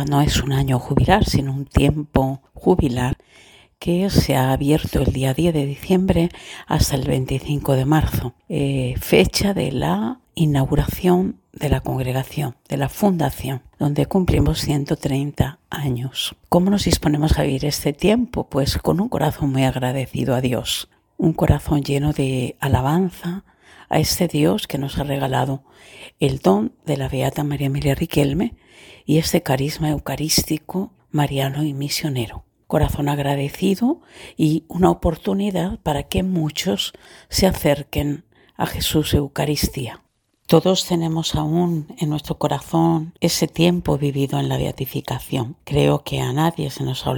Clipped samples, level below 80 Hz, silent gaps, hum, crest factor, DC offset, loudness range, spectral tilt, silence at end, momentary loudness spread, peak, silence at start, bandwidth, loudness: under 0.1%; -34 dBFS; none; none; 20 dB; under 0.1%; 2 LU; -5.5 dB/octave; 0 s; 8 LU; 0 dBFS; 0 s; 18 kHz; -20 LUFS